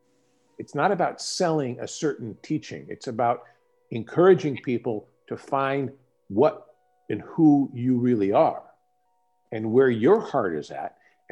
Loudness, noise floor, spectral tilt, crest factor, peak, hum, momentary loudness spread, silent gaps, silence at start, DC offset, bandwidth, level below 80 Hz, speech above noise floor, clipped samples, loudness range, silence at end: -24 LUFS; -70 dBFS; -6.5 dB/octave; 18 dB; -6 dBFS; none; 17 LU; none; 0.6 s; under 0.1%; 11 kHz; -72 dBFS; 47 dB; under 0.1%; 4 LU; 0.45 s